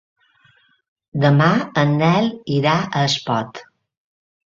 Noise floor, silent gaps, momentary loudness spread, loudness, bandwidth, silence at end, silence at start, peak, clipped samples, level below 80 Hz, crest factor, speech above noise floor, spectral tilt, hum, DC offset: -57 dBFS; none; 11 LU; -18 LUFS; 7.6 kHz; 0.9 s; 1.15 s; -2 dBFS; under 0.1%; -56 dBFS; 18 dB; 40 dB; -6 dB/octave; none; under 0.1%